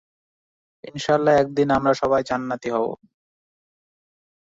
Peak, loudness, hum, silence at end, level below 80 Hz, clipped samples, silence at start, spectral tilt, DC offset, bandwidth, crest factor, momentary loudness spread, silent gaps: -6 dBFS; -21 LUFS; none; 1.6 s; -56 dBFS; under 0.1%; 0.85 s; -6 dB/octave; under 0.1%; 8 kHz; 18 dB; 12 LU; none